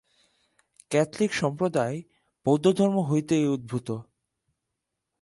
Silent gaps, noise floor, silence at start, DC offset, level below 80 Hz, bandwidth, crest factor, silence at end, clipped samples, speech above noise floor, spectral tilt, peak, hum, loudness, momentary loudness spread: none; -83 dBFS; 0.9 s; under 0.1%; -64 dBFS; 11.5 kHz; 18 dB; 1.2 s; under 0.1%; 59 dB; -6.5 dB/octave; -8 dBFS; none; -26 LUFS; 10 LU